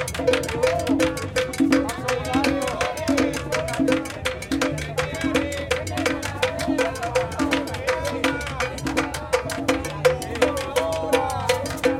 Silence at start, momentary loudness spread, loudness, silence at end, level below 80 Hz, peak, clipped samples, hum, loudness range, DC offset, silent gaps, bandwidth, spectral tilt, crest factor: 0 s; 4 LU; -23 LUFS; 0 s; -42 dBFS; -4 dBFS; under 0.1%; none; 2 LU; under 0.1%; none; 17 kHz; -4.5 dB/octave; 20 dB